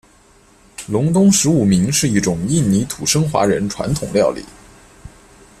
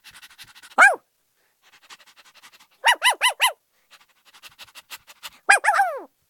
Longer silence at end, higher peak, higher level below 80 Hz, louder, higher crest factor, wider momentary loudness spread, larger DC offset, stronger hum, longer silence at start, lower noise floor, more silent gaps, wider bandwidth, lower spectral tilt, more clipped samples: first, 0.5 s vs 0.25 s; about the same, -2 dBFS vs 0 dBFS; first, -42 dBFS vs -78 dBFS; about the same, -16 LUFS vs -18 LUFS; second, 16 dB vs 24 dB; second, 9 LU vs 25 LU; neither; neither; about the same, 0.8 s vs 0.8 s; second, -50 dBFS vs -68 dBFS; neither; second, 14.5 kHz vs 18 kHz; first, -5 dB/octave vs 2.5 dB/octave; neither